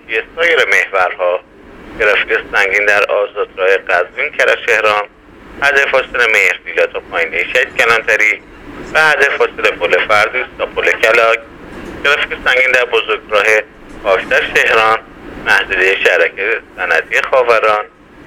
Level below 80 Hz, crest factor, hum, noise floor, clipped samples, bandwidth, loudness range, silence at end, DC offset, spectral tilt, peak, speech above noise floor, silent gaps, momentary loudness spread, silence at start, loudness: -44 dBFS; 14 dB; none; -36 dBFS; under 0.1%; 19.5 kHz; 1 LU; 0.4 s; under 0.1%; -2 dB/octave; 0 dBFS; 24 dB; none; 8 LU; 0.1 s; -12 LUFS